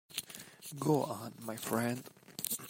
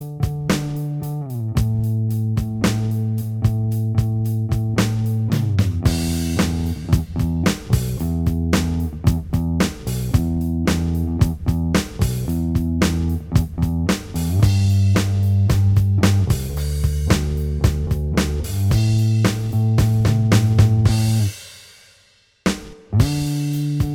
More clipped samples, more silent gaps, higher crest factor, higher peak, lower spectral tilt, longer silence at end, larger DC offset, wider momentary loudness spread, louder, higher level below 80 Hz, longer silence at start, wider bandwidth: neither; neither; first, 24 dB vs 18 dB; second, -12 dBFS vs -2 dBFS; second, -4.5 dB/octave vs -6.5 dB/octave; about the same, 0 s vs 0 s; neither; first, 15 LU vs 7 LU; second, -37 LUFS vs -20 LUFS; second, -76 dBFS vs -28 dBFS; about the same, 0.1 s vs 0 s; about the same, 16 kHz vs 16.5 kHz